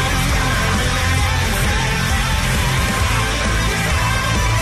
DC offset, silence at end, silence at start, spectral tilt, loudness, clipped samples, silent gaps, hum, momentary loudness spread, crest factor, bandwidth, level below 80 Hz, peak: under 0.1%; 0 s; 0 s; -4 dB/octave; -17 LUFS; under 0.1%; none; none; 1 LU; 12 dB; 14.5 kHz; -22 dBFS; -6 dBFS